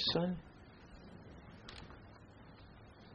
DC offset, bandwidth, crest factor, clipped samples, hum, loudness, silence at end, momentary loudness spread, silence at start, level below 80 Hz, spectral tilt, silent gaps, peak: under 0.1%; 8.2 kHz; 24 dB; under 0.1%; none; -43 LUFS; 0 s; 20 LU; 0 s; -62 dBFS; -6 dB/octave; none; -20 dBFS